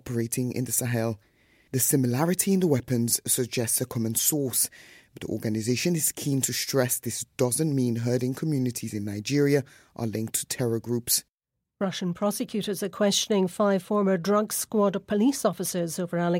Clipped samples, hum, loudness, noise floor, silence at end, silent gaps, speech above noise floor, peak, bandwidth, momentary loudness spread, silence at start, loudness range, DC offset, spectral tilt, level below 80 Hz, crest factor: under 0.1%; none; -26 LUFS; -84 dBFS; 0 s; 11.33-11.38 s; 58 dB; -8 dBFS; 17 kHz; 8 LU; 0.05 s; 3 LU; under 0.1%; -4.5 dB/octave; -64 dBFS; 18 dB